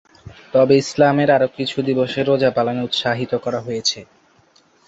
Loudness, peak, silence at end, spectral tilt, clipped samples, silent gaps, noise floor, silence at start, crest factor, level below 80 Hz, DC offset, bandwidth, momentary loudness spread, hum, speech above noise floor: -18 LUFS; -2 dBFS; 0.85 s; -5 dB/octave; under 0.1%; none; -55 dBFS; 0.25 s; 16 dB; -56 dBFS; under 0.1%; 8 kHz; 8 LU; none; 38 dB